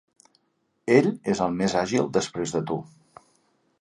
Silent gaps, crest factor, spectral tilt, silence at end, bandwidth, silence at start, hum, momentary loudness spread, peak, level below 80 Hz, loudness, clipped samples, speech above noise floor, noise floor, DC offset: none; 22 dB; -5.5 dB/octave; 0.95 s; 11.5 kHz; 0.85 s; none; 11 LU; -4 dBFS; -60 dBFS; -24 LUFS; under 0.1%; 48 dB; -72 dBFS; under 0.1%